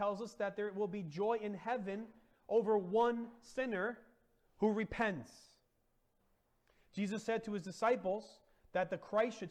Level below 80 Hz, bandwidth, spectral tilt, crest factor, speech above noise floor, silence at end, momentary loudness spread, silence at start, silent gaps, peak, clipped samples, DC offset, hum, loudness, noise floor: -68 dBFS; 10.5 kHz; -6 dB/octave; 16 dB; 40 dB; 0 s; 11 LU; 0 s; none; -22 dBFS; under 0.1%; under 0.1%; none; -38 LUFS; -78 dBFS